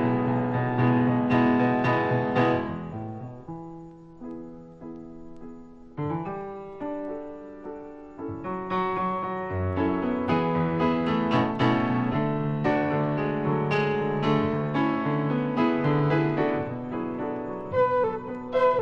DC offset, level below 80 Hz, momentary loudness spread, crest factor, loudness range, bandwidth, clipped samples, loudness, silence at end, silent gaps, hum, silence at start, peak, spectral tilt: under 0.1%; -56 dBFS; 18 LU; 16 dB; 11 LU; 7 kHz; under 0.1%; -26 LUFS; 0 s; none; none; 0 s; -10 dBFS; -9 dB/octave